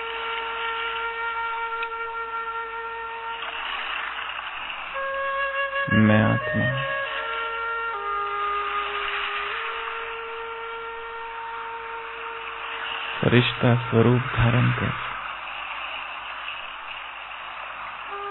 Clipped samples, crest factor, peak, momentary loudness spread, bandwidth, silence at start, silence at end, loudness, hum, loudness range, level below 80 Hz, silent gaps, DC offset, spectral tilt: under 0.1%; 22 dB; -6 dBFS; 13 LU; 4.2 kHz; 0 s; 0 s; -26 LUFS; none; 8 LU; -50 dBFS; none; under 0.1%; -10 dB/octave